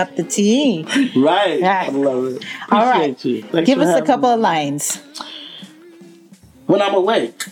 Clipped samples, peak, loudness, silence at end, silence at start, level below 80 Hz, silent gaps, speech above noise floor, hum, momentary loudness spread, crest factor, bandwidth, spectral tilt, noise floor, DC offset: under 0.1%; -2 dBFS; -16 LUFS; 0 s; 0 s; -66 dBFS; none; 29 dB; none; 15 LU; 16 dB; 17 kHz; -4 dB/octave; -45 dBFS; under 0.1%